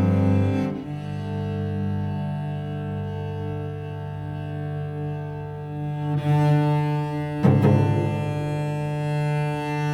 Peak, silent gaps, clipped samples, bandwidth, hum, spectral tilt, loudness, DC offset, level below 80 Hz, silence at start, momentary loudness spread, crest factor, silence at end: -6 dBFS; none; under 0.1%; 10.5 kHz; none; -9 dB/octave; -25 LUFS; under 0.1%; -52 dBFS; 0 s; 12 LU; 18 dB; 0 s